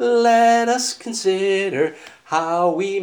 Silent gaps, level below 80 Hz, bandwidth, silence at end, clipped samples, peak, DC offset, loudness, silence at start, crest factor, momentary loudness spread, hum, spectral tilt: none; -78 dBFS; over 20 kHz; 0 s; under 0.1%; -4 dBFS; under 0.1%; -18 LUFS; 0 s; 14 dB; 9 LU; none; -3.5 dB/octave